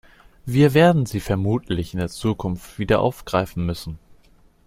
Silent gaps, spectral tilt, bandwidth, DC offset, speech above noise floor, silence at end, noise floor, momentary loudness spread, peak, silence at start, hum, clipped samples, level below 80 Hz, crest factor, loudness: none; -7 dB/octave; 16 kHz; under 0.1%; 34 dB; 0.7 s; -54 dBFS; 14 LU; -2 dBFS; 0.45 s; none; under 0.1%; -42 dBFS; 20 dB; -21 LUFS